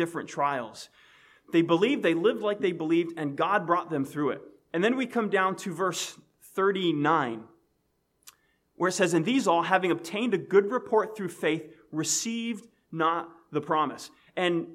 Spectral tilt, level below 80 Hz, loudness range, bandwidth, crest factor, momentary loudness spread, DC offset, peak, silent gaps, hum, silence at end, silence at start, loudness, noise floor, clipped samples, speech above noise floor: -4.5 dB/octave; -78 dBFS; 4 LU; 15 kHz; 20 dB; 11 LU; under 0.1%; -8 dBFS; none; none; 0 s; 0 s; -27 LUFS; -74 dBFS; under 0.1%; 47 dB